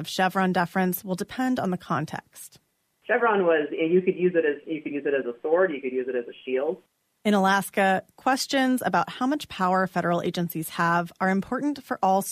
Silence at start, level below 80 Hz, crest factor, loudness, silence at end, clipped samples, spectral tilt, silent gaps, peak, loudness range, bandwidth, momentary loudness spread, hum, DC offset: 0 s; -66 dBFS; 14 dB; -25 LUFS; 0 s; under 0.1%; -5.5 dB/octave; none; -10 dBFS; 2 LU; 15.5 kHz; 9 LU; none; under 0.1%